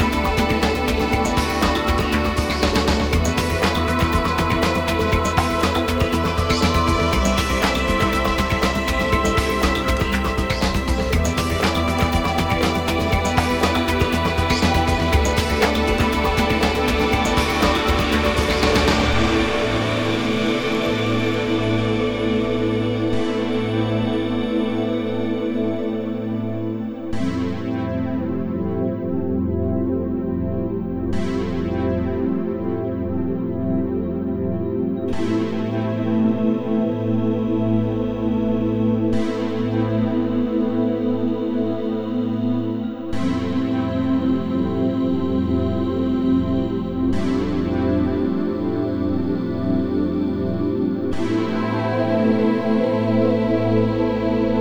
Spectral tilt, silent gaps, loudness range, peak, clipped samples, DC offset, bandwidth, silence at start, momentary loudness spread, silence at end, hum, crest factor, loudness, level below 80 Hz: -6 dB/octave; none; 5 LU; -2 dBFS; under 0.1%; under 0.1%; over 20 kHz; 0 s; 5 LU; 0 s; none; 18 dB; -20 LUFS; -30 dBFS